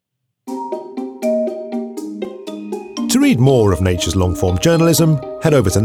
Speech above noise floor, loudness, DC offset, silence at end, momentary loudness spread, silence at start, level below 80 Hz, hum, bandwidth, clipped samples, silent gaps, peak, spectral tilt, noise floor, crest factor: 24 dB; -16 LUFS; under 0.1%; 0 s; 15 LU; 0.45 s; -38 dBFS; none; 17 kHz; under 0.1%; none; -2 dBFS; -5.5 dB/octave; -38 dBFS; 14 dB